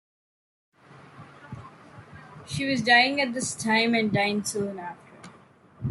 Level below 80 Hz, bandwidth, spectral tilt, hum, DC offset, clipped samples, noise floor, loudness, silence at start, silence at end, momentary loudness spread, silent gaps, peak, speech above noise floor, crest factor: -64 dBFS; 12.5 kHz; -3.5 dB/octave; none; under 0.1%; under 0.1%; -54 dBFS; -24 LUFS; 0.95 s; 0 s; 25 LU; none; -6 dBFS; 30 dB; 22 dB